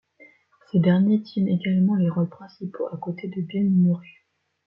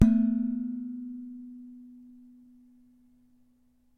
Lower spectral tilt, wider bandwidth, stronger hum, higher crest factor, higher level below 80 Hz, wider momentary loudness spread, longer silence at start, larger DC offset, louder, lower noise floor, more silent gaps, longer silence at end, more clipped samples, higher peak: first, -11.5 dB/octave vs -9.5 dB/octave; about the same, 5.8 kHz vs 6.2 kHz; neither; second, 16 dB vs 28 dB; second, -66 dBFS vs -48 dBFS; second, 12 LU vs 26 LU; first, 0.75 s vs 0 s; neither; first, -23 LUFS vs -30 LUFS; second, -55 dBFS vs -65 dBFS; neither; second, 0.65 s vs 2 s; neither; second, -8 dBFS vs -4 dBFS